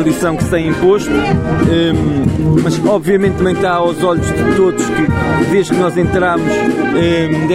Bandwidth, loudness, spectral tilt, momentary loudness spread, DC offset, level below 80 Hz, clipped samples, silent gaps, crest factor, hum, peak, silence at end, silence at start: 15.5 kHz; -13 LUFS; -6.5 dB/octave; 2 LU; under 0.1%; -30 dBFS; under 0.1%; none; 12 dB; none; 0 dBFS; 0 s; 0 s